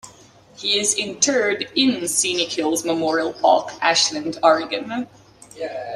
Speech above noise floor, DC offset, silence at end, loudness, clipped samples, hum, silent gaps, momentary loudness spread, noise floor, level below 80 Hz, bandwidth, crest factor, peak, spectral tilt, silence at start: 28 dB; under 0.1%; 0 s; -19 LUFS; under 0.1%; none; none; 11 LU; -48 dBFS; -64 dBFS; 14.5 kHz; 18 dB; -2 dBFS; -1.5 dB/octave; 0.05 s